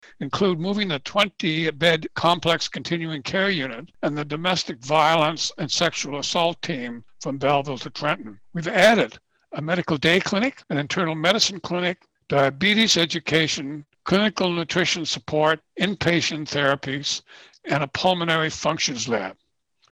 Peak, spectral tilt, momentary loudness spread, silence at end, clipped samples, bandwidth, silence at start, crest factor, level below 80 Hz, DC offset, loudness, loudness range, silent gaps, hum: -6 dBFS; -4 dB/octave; 10 LU; 0.6 s; under 0.1%; 18 kHz; 0.2 s; 16 dB; -58 dBFS; under 0.1%; -22 LUFS; 3 LU; none; none